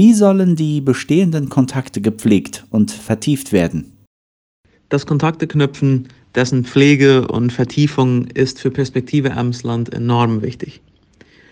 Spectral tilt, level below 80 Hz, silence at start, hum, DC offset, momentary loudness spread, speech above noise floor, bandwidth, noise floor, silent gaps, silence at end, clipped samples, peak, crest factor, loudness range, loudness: -6.5 dB/octave; -50 dBFS; 0 s; none; under 0.1%; 9 LU; 35 dB; 16 kHz; -49 dBFS; 4.07-4.64 s; 0.8 s; under 0.1%; -2 dBFS; 14 dB; 4 LU; -16 LUFS